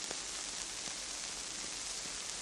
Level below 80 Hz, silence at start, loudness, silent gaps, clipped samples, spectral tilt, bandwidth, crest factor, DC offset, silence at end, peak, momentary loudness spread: -64 dBFS; 0 s; -39 LUFS; none; under 0.1%; 0.5 dB/octave; 16 kHz; 24 dB; under 0.1%; 0 s; -18 dBFS; 1 LU